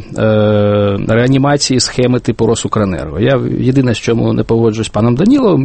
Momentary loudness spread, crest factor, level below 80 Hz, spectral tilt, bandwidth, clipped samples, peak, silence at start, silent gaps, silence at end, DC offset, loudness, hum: 4 LU; 12 dB; -36 dBFS; -6 dB/octave; 8.8 kHz; under 0.1%; 0 dBFS; 0 s; none; 0 s; under 0.1%; -12 LUFS; none